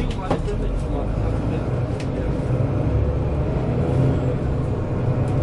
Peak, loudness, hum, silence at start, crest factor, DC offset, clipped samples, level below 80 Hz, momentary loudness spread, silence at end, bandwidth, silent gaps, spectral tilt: -6 dBFS; -23 LUFS; none; 0 s; 16 dB; under 0.1%; under 0.1%; -28 dBFS; 5 LU; 0 s; 10.5 kHz; none; -9 dB/octave